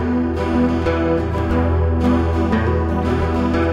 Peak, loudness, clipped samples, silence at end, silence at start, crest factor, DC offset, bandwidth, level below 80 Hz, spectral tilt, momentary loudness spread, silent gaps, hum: -4 dBFS; -18 LUFS; under 0.1%; 0 s; 0 s; 12 dB; under 0.1%; 7.4 kHz; -30 dBFS; -8.5 dB/octave; 2 LU; none; none